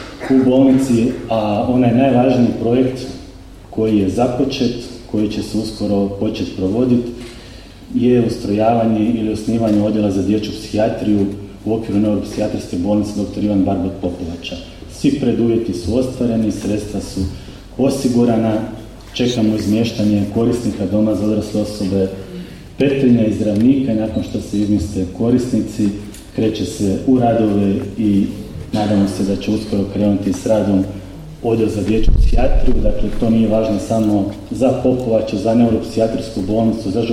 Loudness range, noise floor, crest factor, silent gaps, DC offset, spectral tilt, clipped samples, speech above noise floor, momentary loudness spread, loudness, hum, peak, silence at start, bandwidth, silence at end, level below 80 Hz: 3 LU; -36 dBFS; 14 dB; none; under 0.1%; -7 dB/octave; under 0.1%; 21 dB; 10 LU; -17 LUFS; none; -2 dBFS; 0 s; 14 kHz; 0 s; -28 dBFS